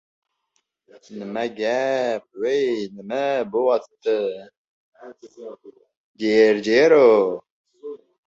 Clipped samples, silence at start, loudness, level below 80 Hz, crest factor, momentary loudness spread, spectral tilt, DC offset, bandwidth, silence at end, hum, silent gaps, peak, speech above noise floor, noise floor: under 0.1%; 1.1 s; -20 LUFS; -68 dBFS; 18 dB; 23 LU; -5 dB/octave; under 0.1%; 7.6 kHz; 0.3 s; none; 4.57-4.92 s, 5.97-6.14 s, 7.50-7.65 s; -4 dBFS; 52 dB; -73 dBFS